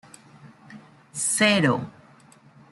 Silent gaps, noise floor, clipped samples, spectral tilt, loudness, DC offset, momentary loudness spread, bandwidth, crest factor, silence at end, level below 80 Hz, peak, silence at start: none; -53 dBFS; under 0.1%; -3.5 dB/octave; -21 LUFS; under 0.1%; 19 LU; 12 kHz; 20 dB; 0.8 s; -68 dBFS; -6 dBFS; 0.45 s